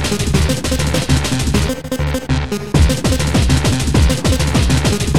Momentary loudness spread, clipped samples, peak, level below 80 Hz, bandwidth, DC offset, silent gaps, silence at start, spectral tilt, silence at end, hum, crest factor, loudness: 5 LU; under 0.1%; -2 dBFS; -20 dBFS; 16.5 kHz; 3%; none; 0 s; -5 dB/octave; 0 s; none; 14 dB; -16 LUFS